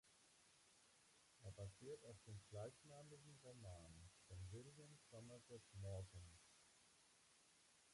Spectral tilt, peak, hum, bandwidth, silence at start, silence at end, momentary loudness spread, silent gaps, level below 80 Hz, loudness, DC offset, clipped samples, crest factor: -5 dB/octave; -44 dBFS; none; 11.5 kHz; 0.05 s; 0 s; 8 LU; none; -72 dBFS; -60 LUFS; under 0.1%; under 0.1%; 18 dB